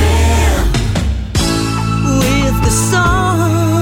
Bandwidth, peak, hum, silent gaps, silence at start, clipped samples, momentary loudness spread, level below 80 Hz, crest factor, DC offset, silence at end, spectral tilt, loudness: 16.5 kHz; -2 dBFS; none; none; 0 s; under 0.1%; 4 LU; -18 dBFS; 10 dB; under 0.1%; 0 s; -5 dB/octave; -13 LUFS